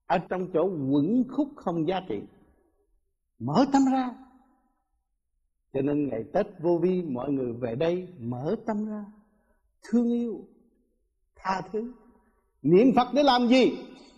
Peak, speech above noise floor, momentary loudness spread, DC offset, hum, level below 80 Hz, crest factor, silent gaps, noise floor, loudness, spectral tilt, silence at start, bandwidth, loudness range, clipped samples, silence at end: -8 dBFS; 51 dB; 14 LU; under 0.1%; none; -62 dBFS; 20 dB; none; -76 dBFS; -26 LUFS; -7 dB/octave; 0.1 s; 8 kHz; 7 LU; under 0.1%; 0.25 s